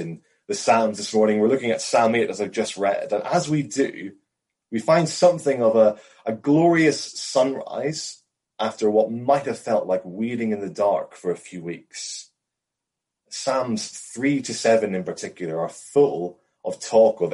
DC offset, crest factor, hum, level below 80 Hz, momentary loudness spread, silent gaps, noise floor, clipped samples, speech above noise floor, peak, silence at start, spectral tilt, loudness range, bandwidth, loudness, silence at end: under 0.1%; 16 dB; none; -70 dBFS; 14 LU; none; -84 dBFS; under 0.1%; 63 dB; -6 dBFS; 0 s; -5 dB/octave; 8 LU; 11.5 kHz; -22 LUFS; 0 s